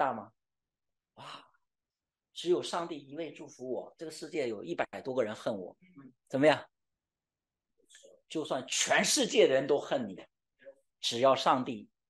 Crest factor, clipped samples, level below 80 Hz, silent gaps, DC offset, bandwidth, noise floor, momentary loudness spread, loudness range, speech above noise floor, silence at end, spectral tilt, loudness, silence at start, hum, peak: 22 dB; under 0.1%; -82 dBFS; none; under 0.1%; 12.5 kHz; under -90 dBFS; 19 LU; 9 LU; over 58 dB; 0.25 s; -3 dB/octave; -31 LUFS; 0 s; none; -10 dBFS